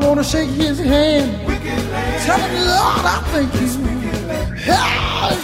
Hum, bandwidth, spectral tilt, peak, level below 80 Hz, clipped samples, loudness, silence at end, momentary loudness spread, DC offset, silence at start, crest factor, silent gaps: none; 16 kHz; -4.5 dB/octave; -2 dBFS; -28 dBFS; under 0.1%; -17 LUFS; 0 s; 7 LU; under 0.1%; 0 s; 14 dB; none